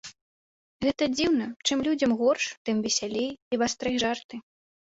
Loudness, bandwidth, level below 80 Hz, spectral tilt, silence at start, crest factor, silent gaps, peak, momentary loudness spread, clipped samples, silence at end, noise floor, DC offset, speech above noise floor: -27 LUFS; 8 kHz; -60 dBFS; -3 dB/octave; 0.05 s; 18 dB; 0.21-0.80 s, 2.57-2.65 s, 3.42-3.51 s, 4.24-4.29 s; -10 dBFS; 8 LU; under 0.1%; 0.45 s; under -90 dBFS; under 0.1%; over 63 dB